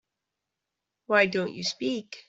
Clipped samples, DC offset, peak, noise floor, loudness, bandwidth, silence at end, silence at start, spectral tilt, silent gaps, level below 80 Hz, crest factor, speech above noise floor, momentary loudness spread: under 0.1%; under 0.1%; -8 dBFS; -86 dBFS; -26 LUFS; 8 kHz; 0.1 s; 1.1 s; -4 dB/octave; none; -72 dBFS; 22 dB; 59 dB; 9 LU